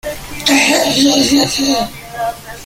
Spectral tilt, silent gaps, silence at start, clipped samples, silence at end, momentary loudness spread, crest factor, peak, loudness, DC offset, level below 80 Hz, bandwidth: -2.5 dB/octave; none; 0.05 s; under 0.1%; 0 s; 12 LU; 14 dB; 0 dBFS; -12 LUFS; under 0.1%; -40 dBFS; 17 kHz